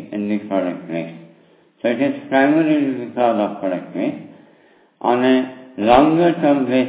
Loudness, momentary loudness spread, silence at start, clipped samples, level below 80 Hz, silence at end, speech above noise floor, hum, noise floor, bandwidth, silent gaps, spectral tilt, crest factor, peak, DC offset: -18 LUFS; 12 LU; 0 s; under 0.1%; -52 dBFS; 0 s; 36 dB; none; -53 dBFS; 4 kHz; none; -10.5 dB/octave; 18 dB; 0 dBFS; under 0.1%